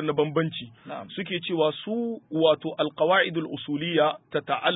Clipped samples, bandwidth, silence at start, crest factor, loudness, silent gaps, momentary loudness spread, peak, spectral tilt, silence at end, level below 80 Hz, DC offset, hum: under 0.1%; 4 kHz; 0 s; 18 dB; -26 LUFS; none; 11 LU; -8 dBFS; -10 dB/octave; 0 s; -70 dBFS; under 0.1%; none